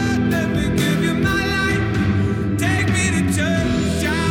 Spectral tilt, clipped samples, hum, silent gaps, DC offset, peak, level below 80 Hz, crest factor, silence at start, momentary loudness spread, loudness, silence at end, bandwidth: -5.5 dB/octave; under 0.1%; none; none; under 0.1%; -6 dBFS; -34 dBFS; 12 dB; 0 s; 2 LU; -19 LUFS; 0 s; 17.5 kHz